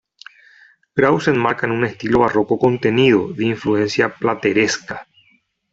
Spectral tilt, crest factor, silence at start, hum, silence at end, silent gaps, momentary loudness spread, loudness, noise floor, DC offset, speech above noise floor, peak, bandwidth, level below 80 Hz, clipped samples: -5.5 dB/octave; 16 dB; 0.95 s; none; 0.7 s; none; 6 LU; -17 LUFS; -59 dBFS; under 0.1%; 43 dB; -2 dBFS; 8 kHz; -52 dBFS; under 0.1%